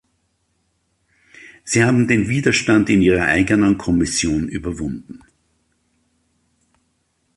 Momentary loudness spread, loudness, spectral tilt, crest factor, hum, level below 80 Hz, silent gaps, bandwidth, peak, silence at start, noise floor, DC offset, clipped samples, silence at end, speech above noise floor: 12 LU; -17 LUFS; -5 dB/octave; 18 dB; none; -40 dBFS; none; 11.5 kHz; -2 dBFS; 1.45 s; -67 dBFS; under 0.1%; under 0.1%; 2.2 s; 51 dB